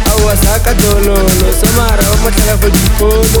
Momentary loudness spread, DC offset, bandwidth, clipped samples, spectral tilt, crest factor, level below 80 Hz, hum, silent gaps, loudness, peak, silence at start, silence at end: 1 LU; under 0.1%; over 20 kHz; 0.2%; -4.5 dB/octave; 8 dB; -12 dBFS; none; none; -10 LUFS; 0 dBFS; 0 s; 0 s